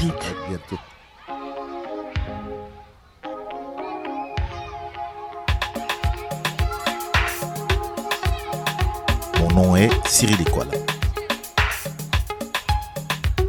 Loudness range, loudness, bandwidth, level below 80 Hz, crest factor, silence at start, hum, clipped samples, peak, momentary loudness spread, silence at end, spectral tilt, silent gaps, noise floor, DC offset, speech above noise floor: 13 LU; -23 LUFS; 18 kHz; -30 dBFS; 20 dB; 0 s; none; under 0.1%; -2 dBFS; 17 LU; 0 s; -4.5 dB/octave; none; -47 dBFS; under 0.1%; 26 dB